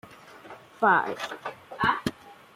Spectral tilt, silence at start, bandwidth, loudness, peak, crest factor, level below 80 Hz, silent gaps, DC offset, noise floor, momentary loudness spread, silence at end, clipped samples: -4.5 dB/octave; 0.05 s; 16 kHz; -26 LUFS; -10 dBFS; 20 dB; -60 dBFS; none; under 0.1%; -48 dBFS; 24 LU; 0.2 s; under 0.1%